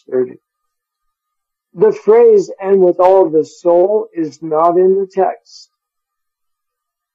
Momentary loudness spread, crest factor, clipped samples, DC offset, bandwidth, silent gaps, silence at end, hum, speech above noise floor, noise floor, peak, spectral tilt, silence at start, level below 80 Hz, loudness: 10 LU; 14 dB; under 0.1%; under 0.1%; 7.6 kHz; none; 1.8 s; none; 66 dB; -78 dBFS; 0 dBFS; -7.5 dB/octave; 0.1 s; -64 dBFS; -12 LUFS